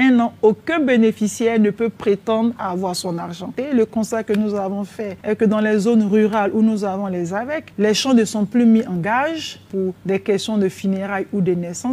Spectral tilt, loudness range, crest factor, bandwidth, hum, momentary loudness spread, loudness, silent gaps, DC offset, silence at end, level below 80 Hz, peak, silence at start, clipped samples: -5.5 dB/octave; 4 LU; 14 dB; 14 kHz; none; 9 LU; -19 LUFS; none; under 0.1%; 0 s; -60 dBFS; -4 dBFS; 0 s; under 0.1%